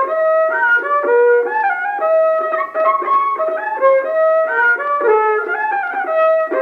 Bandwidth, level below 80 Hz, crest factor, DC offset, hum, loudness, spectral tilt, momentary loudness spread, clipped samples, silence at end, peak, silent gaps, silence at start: 4.7 kHz; -70 dBFS; 12 dB; under 0.1%; none; -15 LUFS; -4 dB/octave; 5 LU; under 0.1%; 0 s; -2 dBFS; none; 0 s